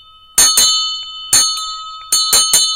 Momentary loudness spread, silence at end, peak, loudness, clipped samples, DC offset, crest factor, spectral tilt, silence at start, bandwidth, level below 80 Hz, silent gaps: 14 LU; 0 s; 0 dBFS; -11 LUFS; under 0.1%; under 0.1%; 14 dB; 2.5 dB/octave; 0.35 s; over 20 kHz; -48 dBFS; none